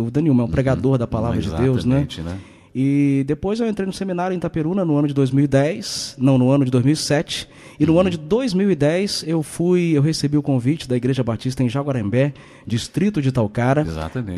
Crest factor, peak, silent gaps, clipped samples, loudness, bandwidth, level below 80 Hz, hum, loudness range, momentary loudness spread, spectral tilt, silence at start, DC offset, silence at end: 16 dB; -4 dBFS; none; under 0.1%; -19 LUFS; 13 kHz; -44 dBFS; none; 3 LU; 8 LU; -6.5 dB/octave; 0 s; under 0.1%; 0 s